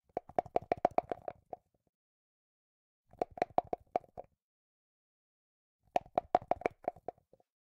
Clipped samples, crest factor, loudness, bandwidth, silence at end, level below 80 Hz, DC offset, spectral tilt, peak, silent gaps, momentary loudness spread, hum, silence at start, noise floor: under 0.1%; 28 dB; -37 LUFS; 8.6 kHz; 0.7 s; -68 dBFS; under 0.1%; -6.5 dB/octave; -12 dBFS; 1.89-3.04 s, 4.42-5.79 s; 18 LU; none; 0.15 s; -54 dBFS